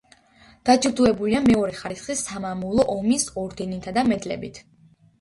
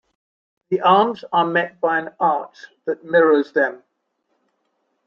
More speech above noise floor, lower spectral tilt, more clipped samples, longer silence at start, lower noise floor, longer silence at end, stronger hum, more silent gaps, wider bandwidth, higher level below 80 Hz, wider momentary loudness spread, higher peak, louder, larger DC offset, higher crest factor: second, 32 dB vs 53 dB; second, -4.5 dB/octave vs -7 dB/octave; neither; about the same, 0.65 s vs 0.7 s; second, -54 dBFS vs -71 dBFS; second, 0.6 s vs 1.3 s; neither; neither; first, 11.5 kHz vs 6.8 kHz; first, -48 dBFS vs -72 dBFS; about the same, 12 LU vs 12 LU; about the same, -4 dBFS vs -2 dBFS; second, -23 LUFS vs -19 LUFS; neither; about the same, 20 dB vs 18 dB